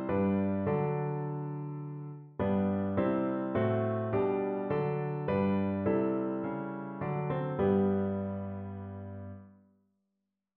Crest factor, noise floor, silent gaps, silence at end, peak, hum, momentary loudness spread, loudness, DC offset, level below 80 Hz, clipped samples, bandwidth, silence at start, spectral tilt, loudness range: 16 dB; -85 dBFS; none; 1.05 s; -16 dBFS; none; 12 LU; -32 LUFS; under 0.1%; -64 dBFS; under 0.1%; 4.3 kHz; 0 s; -8.5 dB/octave; 3 LU